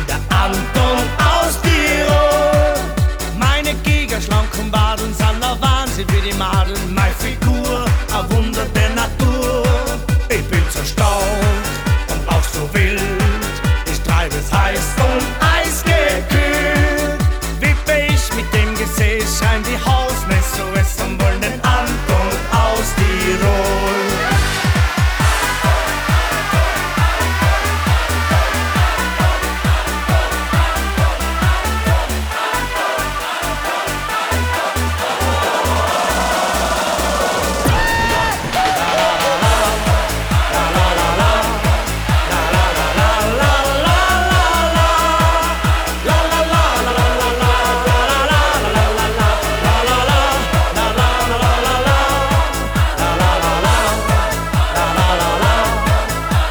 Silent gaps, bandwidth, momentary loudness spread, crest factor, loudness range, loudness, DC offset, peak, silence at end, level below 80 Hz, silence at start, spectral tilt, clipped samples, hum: none; over 20 kHz; 4 LU; 12 dB; 3 LU; -15 LUFS; under 0.1%; -4 dBFS; 0 s; -20 dBFS; 0 s; -4.5 dB/octave; under 0.1%; none